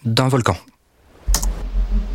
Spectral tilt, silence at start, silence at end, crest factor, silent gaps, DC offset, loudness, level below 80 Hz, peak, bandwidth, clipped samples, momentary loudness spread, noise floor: -4.5 dB/octave; 0.05 s; 0 s; 18 dB; none; under 0.1%; -21 LUFS; -24 dBFS; 0 dBFS; 17 kHz; under 0.1%; 11 LU; -52 dBFS